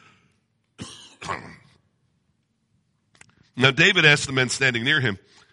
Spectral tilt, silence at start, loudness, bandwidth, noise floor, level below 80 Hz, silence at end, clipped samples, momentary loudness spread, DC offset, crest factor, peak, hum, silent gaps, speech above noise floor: -3.5 dB/octave; 0.8 s; -18 LUFS; 11.5 kHz; -70 dBFS; -60 dBFS; 0.35 s; under 0.1%; 25 LU; under 0.1%; 22 dB; -2 dBFS; none; none; 49 dB